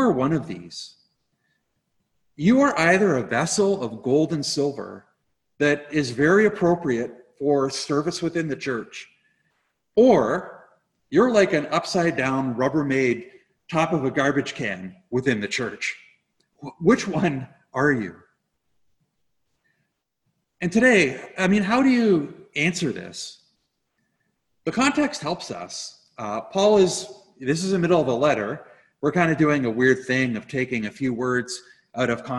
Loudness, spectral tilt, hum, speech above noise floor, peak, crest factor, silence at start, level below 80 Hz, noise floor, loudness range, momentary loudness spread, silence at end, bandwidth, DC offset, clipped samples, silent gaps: -22 LUFS; -5 dB/octave; none; 53 dB; -4 dBFS; 20 dB; 0 s; -58 dBFS; -75 dBFS; 5 LU; 16 LU; 0 s; 12 kHz; under 0.1%; under 0.1%; none